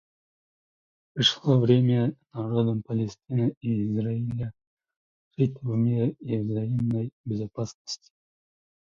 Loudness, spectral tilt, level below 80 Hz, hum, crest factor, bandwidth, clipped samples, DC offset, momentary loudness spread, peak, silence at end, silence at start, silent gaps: -26 LUFS; -7 dB/octave; -60 dBFS; none; 20 dB; 7.4 kHz; under 0.1%; under 0.1%; 14 LU; -8 dBFS; 0.85 s; 1.15 s; 3.57-3.61 s, 4.67-4.77 s, 4.96-5.31 s, 7.13-7.24 s, 7.74-7.85 s